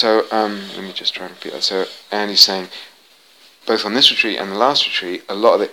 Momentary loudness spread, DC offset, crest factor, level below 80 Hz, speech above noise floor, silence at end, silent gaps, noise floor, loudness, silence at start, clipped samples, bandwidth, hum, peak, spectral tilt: 17 LU; 0.1%; 18 dB; -72 dBFS; 32 dB; 0 s; none; -50 dBFS; -16 LUFS; 0 s; under 0.1%; 19.5 kHz; none; 0 dBFS; -2 dB/octave